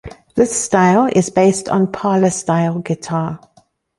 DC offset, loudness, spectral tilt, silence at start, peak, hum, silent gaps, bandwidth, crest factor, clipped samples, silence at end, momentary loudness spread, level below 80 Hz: under 0.1%; -16 LUFS; -5.5 dB/octave; 0.05 s; -2 dBFS; none; none; 11.5 kHz; 14 dB; under 0.1%; 0.6 s; 10 LU; -50 dBFS